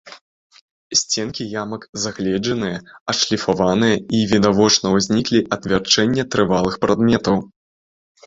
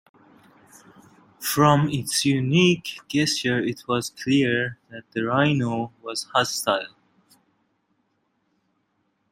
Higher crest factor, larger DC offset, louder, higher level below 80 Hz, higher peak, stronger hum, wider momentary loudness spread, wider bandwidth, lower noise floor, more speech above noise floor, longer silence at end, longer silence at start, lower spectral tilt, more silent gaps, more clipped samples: about the same, 18 dB vs 20 dB; neither; first, -18 LUFS vs -23 LUFS; first, -48 dBFS vs -62 dBFS; first, 0 dBFS vs -4 dBFS; neither; about the same, 10 LU vs 12 LU; second, 7.8 kHz vs 16 kHz; first, under -90 dBFS vs -71 dBFS; first, over 72 dB vs 49 dB; second, 0.8 s vs 2.45 s; second, 0.05 s vs 1.4 s; about the same, -4 dB/octave vs -4.5 dB/octave; first, 0.21-0.50 s, 0.61-0.90 s, 1.89-1.93 s, 3.01-3.06 s vs none; neither